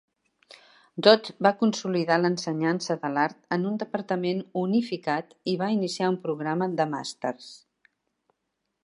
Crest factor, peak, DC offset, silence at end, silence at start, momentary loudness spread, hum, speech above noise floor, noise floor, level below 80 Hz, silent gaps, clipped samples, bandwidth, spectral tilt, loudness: 24 dB; -2 dBFS; under 0.1%; 1.3 s; 0.95 s; 10 LU; none; 54 dB; -80 dBFS; -78 dBFS; none; under 0.1%; 11.5 kHz; -5.5 dB/octave; -26 LUFS